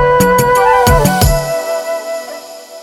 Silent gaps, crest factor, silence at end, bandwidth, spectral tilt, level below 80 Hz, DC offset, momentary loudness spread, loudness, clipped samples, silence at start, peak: none; 12 dB; 0 s; 19 kHz; -4.5 dB/octave; -22 dBFS; under 0.1%; 17 LU; -11 LUFS; under 0.1%; 0 s; 0 dBFS